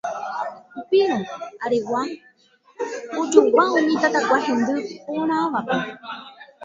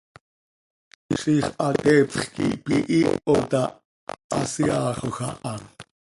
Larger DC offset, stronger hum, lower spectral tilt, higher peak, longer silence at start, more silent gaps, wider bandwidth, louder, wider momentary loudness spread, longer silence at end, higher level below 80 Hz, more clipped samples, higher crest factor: neither; neither; about the same, -4.5 dB/octave vs -5.5 dB/octave; first, 0 dBFS vs -4 dBFS; second, 0.05 s vs 1.1 s; second, none vs 3.85-4.07 s, 4.24-4.30 s; second, 7.8 kHz vs 11.5 kHz; about the same, -21 LUFS vs -23 LUFS; about the same, 15 LU vs 14 LU; second, 0 s vs 0.35 s; second, -66 dBFS vs -54 dBFS; neither; about the same, 22 dB vs 20 dB